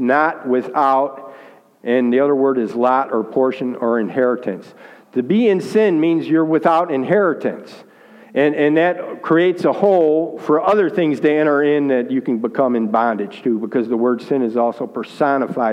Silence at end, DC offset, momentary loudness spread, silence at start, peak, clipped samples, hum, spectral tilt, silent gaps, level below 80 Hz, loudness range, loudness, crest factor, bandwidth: 0 s; under 0.1%; 8 LU; 0 s; -2 dBFS; under 0.1%; none; -7.5 dB/octave; none; -72 dBFS; 3 LU; -17 LUFS; 16 dB; 10 kHz